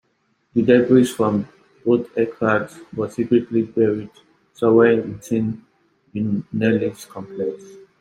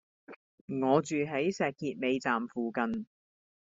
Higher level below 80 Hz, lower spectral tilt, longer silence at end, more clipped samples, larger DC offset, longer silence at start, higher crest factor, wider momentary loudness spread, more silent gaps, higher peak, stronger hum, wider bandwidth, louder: first, -58 dBFS vs -72 dBFS; first, -7 dB/octave vs -5 dB/octave; second, 0.25 s vs 0.65 s; neither; neither; first, 0.55 s vs 0.3 s; about the same, 18 dB vs 20 dB; first, 16 LU vs 12 LU; second, none vs 0.36-0.68 s; first, -2 dBFS vs -12 dBFS; neither; first, 15.5 kHz vs 7.8 kHz; first, -20 LUFS vs -32 LUFS